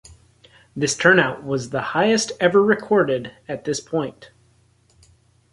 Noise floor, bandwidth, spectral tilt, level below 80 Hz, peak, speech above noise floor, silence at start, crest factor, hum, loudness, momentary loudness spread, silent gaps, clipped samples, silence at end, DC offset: -58 dBFS; 11.5 kHz; -4 dB/octave; -58 dBFS; -2 dBFS; 39 dB; 0.1 s; 20 dB; none; -20 LUFS; 13 LU; none; under 0.1%; 1.3 s; under 0.1%